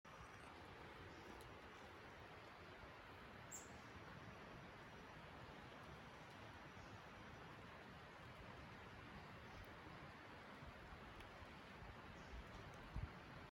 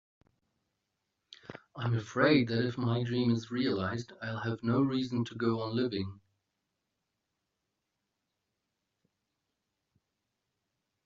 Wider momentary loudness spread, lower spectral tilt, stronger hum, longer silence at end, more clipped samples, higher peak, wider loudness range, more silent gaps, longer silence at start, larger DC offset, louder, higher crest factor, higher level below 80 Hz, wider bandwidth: second, 3 LU vs 13 LU; about the same, -4.5 dB/octave vs -5.5 dB/octave; neither; second, 0 s vs 4.9 s; neither; second, -38 dBFS vs -12 dBFS; second, 1 LU vs 8 LU; neither; second, 0.05 s vs 1.3 s; neither; second, -58 LUFS vs -32 LUFS; about the same, 20 dB vs 24 dB; about the same, -66 dBFS vs -70 dBFS; first, 16 kHz vs 7.4 kHz